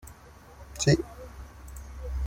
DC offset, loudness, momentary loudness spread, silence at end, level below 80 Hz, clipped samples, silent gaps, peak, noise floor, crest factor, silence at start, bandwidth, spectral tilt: under 0.1%; -27 LUFS; 25 LU; 0 s; -40 dBFS; under 0.1%; none; -10 dBFS; -50 dBFS; 22 dB; 0.05 s; 16.5 kHz; -5 dB/octave